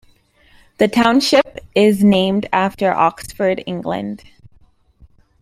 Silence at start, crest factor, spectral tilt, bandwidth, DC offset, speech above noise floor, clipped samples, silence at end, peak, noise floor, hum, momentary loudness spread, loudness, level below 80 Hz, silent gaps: 0.8 s; 18 dB; -5.5 dB/octave; 15 kHz; under 0.1%; 37 dB; under 0.1%; 1.25 s; 0 dBFS; -52 dBFS; none; 11 LU; -16 LUFS; -50 dBFS; none